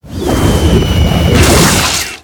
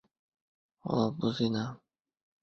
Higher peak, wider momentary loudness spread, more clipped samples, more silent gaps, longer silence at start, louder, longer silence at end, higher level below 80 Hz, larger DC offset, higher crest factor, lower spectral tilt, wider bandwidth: first, 0 dBFS vs -14 dBFS; second, 6 LU vs 10 LU; first, 1% vs under 0.1%; neither; second, 0.05 s vs 0.85 s; first, -9 LUFS vs -32 LUFS; second, 0.05 s vs 0.65 s; first, -16 dBFS vs -66 dBFS; neither; second, 10 dB vs 22 dB; second, -4.5 dB/octave vs -7 dB/octave; first, over 20 kHz vs 6.8 kHz